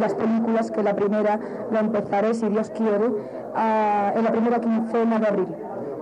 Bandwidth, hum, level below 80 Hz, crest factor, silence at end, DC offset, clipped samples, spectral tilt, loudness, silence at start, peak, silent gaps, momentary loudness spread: 9.2 kHz; none; -66 dBFS; 10 dB; 0 s; under 0.1%; under 0.1%; -7.5 dB/octave; -23 LUFS; 0 s; -12 dBFS; none; 6 LU